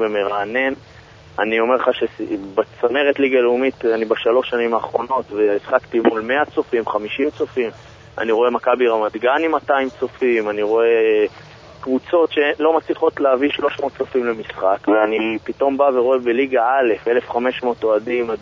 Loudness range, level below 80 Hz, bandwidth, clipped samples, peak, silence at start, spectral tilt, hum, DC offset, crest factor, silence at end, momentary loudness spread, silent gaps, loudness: 2 LU; -56 dBFS; 7.2 kHz; under 0.1%; 0 dBFS; 0 s; -6 dB/octave; none; under 0.1%; 18 dB; 0 s; 7 LU; none; -18 LUFS